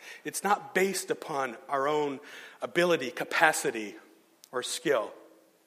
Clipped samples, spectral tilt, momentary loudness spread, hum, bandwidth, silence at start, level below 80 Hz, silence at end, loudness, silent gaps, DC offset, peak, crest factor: under 0.1%; -3 dB/octave; 14 LU; none; 15.5 kHz; 0 s; -84 dBFS; 0.45 s; -29 LUFS; none; under 0.1%; -6 dBFS; 24 dB